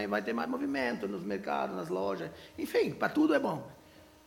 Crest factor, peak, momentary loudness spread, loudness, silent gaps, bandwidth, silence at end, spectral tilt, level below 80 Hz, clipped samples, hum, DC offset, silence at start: 18 dB; -14 dBFS; 12 LU; -33 LUFS; none; 17 kHz; 0.2 s; -6 dB/octave; -68 dBFS; under 0.1%; none; under 0.1%; 0 s